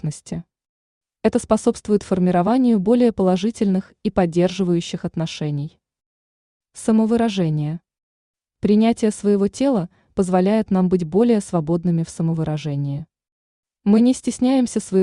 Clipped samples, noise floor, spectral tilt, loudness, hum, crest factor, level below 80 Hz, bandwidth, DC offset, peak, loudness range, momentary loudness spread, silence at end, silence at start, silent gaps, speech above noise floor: under 0.1%; under -90 dBFS; -7 dB/octave; -19 LUFS; none; 16 dB; -50 dBFS; 11 kHz; under 0.1%; -4 dBFS; 4 LU; 10 LU; 0 s; 0.05 s; 0.69-1.01 s, 6.06-6.60 s, 8.03-8.34 s, 13.32-13.63 s; over 72 dB